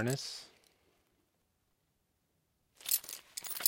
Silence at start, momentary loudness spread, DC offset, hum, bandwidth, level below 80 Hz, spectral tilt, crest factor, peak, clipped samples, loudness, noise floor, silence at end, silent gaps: 0 s; 14 LU; under 0.1%; none; 17 kHz; -82 dBFS; -2.5 dB/octave; 34 dB; -8 dBFS; under 0.1%; -37 LUFS; -79 dBFS; 0 s; none